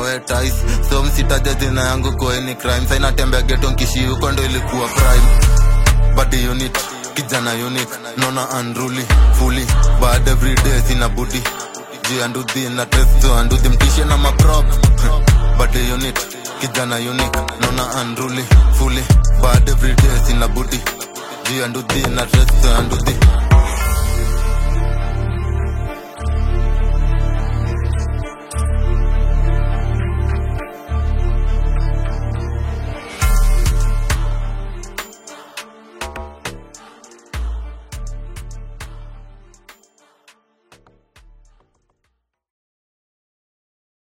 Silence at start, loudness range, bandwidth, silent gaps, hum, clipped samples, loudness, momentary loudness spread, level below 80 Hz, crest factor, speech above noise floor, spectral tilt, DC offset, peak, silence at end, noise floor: 0 s; 14 LU; 16.5 kHz; none; none; under 0.1%; -17 LUFS; 14 LU; -16 dBFS; 14 dB; 57 dB; -4.5 dB/octave; under 0.1%; 0 dBFS; 4.9 s; -70 dBFS